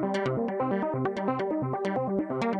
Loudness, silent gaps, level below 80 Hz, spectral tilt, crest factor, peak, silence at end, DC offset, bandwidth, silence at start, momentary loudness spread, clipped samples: -29 LUFS; none; -64 dBFS; -8 dB/octave; 14 dB; -14 dBFS; 0 s; under 0.1%; 9.2 kHz; 0 s; 1 LU; under 0.1%